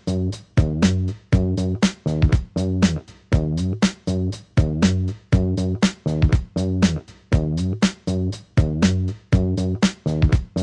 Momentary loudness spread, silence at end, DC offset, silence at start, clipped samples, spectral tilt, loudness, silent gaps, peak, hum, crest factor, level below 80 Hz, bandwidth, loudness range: 5 LU; 0 s; under 0.1%; 0.05 s; under 0.1%; -6.5 dB/octave; -21 LUFS; none; -4 dBFS; none; 16 dB; -30 dBFS; 11 kHz; 1 LU